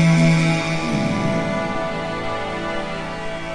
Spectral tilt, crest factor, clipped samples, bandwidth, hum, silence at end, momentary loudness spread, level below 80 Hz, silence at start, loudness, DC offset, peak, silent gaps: -6 dB/octave; 14 dB; under 0.1%; 10.5 kHz; none; 0 s; 11 LU; -40 dBFS; 0 s; -21 LUFS; under 0.1%; -6 dBFS; none